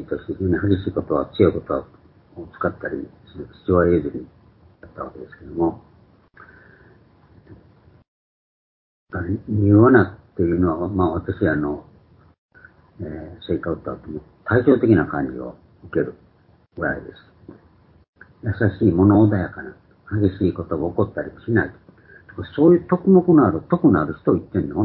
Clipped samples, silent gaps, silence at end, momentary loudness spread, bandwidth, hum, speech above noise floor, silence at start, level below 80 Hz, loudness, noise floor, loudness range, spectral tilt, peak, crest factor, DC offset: under 0.1%; 8.08-9.06 s, 12.38-12.49 s, 18.08-18.13 s; 0 s; 19 LU; 4.4 kHz; none; 36 dB; 0 s; -42 dBFS; -20 LUFS; -56 dBFS; 12 LU; -13 dB/octave; -2 dBFS; 20 dB; under 0.1%